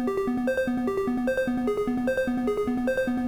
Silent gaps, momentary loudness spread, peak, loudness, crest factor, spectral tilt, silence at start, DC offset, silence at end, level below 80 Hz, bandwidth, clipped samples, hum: none; 1 LU; -14 dBFS; -26 LUFS; 12 dB; -6.5 dB/octave; 0 s; 0.2%; 0 s; -50 dBFS; 18.5 kHz; under 0.1%; none